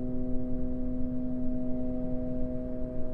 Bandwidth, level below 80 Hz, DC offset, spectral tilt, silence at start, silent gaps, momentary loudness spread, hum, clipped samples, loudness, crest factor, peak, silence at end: 2 kHz; -36 dBFS; under 0.1%; -12 dB/octave; 0 s; none; 2 LU; none; under 0.1%; -35 LUFS; 12 dB; -16 dBFS; 0 s